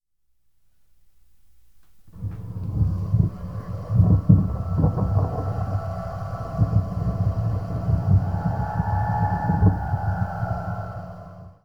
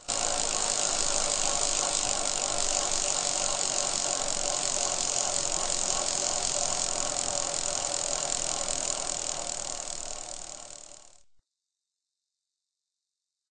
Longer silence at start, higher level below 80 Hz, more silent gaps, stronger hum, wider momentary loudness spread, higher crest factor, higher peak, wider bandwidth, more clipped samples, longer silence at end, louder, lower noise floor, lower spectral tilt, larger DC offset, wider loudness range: about the same, 0 s vs 0 s; first, -34 dBFS vs -48 dBFS; neither; neither; first, 14 LU vs 8 LU; about the same, 22 dB vs 22 dB; first, -2 dBFS vs -10 dBFS; second, 5.2 kHz vs 9.6 kHz; neither; second, 0 s vs 2.5 s; first, -24 LUFS vs -27 LUFS; second, -68 dBFS vs -87 dBFS; first, -10.5 dB/octave vs 0 dB/octave; first, 0.6% vs 0.2%; second, 7 LU vs 11 LU